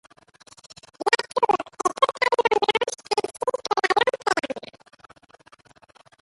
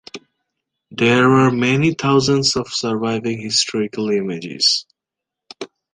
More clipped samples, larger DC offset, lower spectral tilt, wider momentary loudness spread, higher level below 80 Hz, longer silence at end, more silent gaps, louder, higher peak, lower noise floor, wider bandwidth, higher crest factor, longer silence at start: neither; neither; second, -1.5 dB/octave vs -4.5 dB/octave; second, 8 LU vs 21 LU; second, -68 dBFS vs -54 dBFS; first, 1.65 s vs 0.25 s; neither; second, -23 LUFS vs -17 LUFS; about the same, -4 dBFS vs -2 dBFS; second, -55 dBFS vs -84 dBFS; first, 11.5 kHz vs 10 kHz; first, 22 dB vs 16 dB; first, 1 s vs 0.15 s